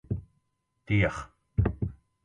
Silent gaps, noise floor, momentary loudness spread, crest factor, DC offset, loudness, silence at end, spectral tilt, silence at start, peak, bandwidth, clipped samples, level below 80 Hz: none; -76 dBFS; 11 LU; 20 dB; under 0.1%; -30 LUFS; 0.3 s; -7.5 dB/octave; 0.1 s; -10 dBFS; 9.2 kHz; under 0.1%; -40 dBFS